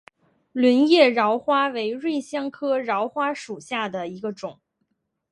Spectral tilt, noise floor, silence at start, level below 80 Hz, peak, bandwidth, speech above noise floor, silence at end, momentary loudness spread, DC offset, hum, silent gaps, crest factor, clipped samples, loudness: -4.5 dB/octave; -74 dBFS; 0.55 s; -74 dBFS; -4 dBFS; 11.5 kHz; 52 dB; 0.8 s; 15 LU; under 0.1%; none; none; 20 dB; under 0.1%; -22 LUFS